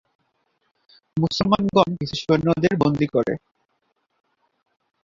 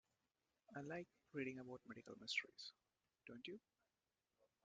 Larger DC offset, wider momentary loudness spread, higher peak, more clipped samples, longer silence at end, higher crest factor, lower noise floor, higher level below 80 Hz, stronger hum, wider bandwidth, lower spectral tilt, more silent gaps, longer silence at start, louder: neither; second, 9 LU vs 13 LU; first, -2 dBFS vs -30 dBFS; neither; first, 1.65 s vs 1.05 s; about the same, 22 dB vs 26 dB; second, -71 dBFS vs under -90 dBFS; first, -52 dBFS vs under -90 dBFS; neither; second, 7.6 kHz vs 8.8 kHz; first, -7 dB/octave vs -4 dB/octave; neither; first, 1.15 s vs 0.7 s; first, -21 LUFS vs -52 LUFS